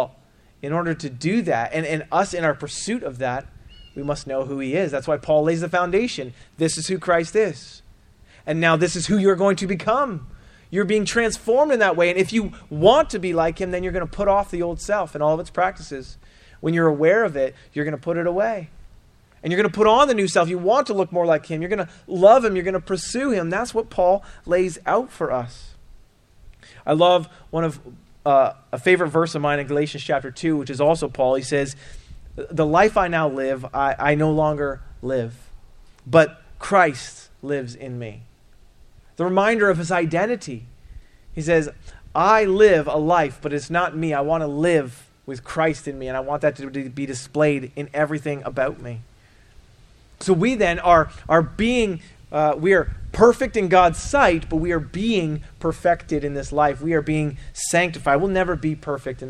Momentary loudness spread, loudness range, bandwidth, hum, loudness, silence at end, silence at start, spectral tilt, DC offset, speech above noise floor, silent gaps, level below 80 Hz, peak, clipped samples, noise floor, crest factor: 13 LU; 5 LU; 13 kHz; none; -21 LUFS; 0 s; 0 s; -5.5 dB/octave; under 0.1%; 33 dB; none; -42 dBFS; 0 dBFS; under 0.1%; -54 dBFS; 20 dB